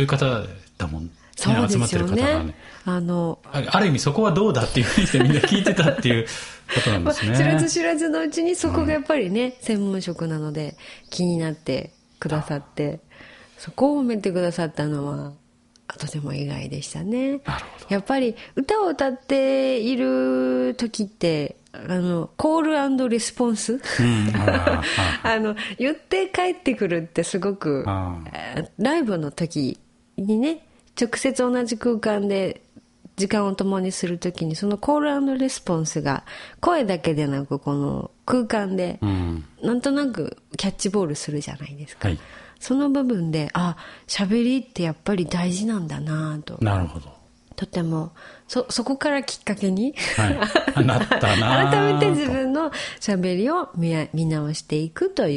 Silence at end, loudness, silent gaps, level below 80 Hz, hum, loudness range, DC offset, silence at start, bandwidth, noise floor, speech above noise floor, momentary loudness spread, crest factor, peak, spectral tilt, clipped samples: 0 s; -23 LUFS; none; -46 dBFS; none; 6 LU; under 0.1%; 0 s; 11.5 kHz; -50 dBFS; 28 dB; 11 LU; 22 dB; -2 dBFS; -5.5 dB/octave; under 0.1%